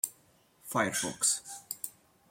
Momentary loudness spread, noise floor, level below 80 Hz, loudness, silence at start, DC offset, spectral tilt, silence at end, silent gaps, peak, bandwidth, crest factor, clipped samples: 13 LU; -65 dBFS; -72 dBFS; -32 LUFS; 0.05 s; under 0.1%; -1.5 dB/octave; 0.4 s; none; -10 dBFS; 16.5 kHz; 26 dB; under 0.1%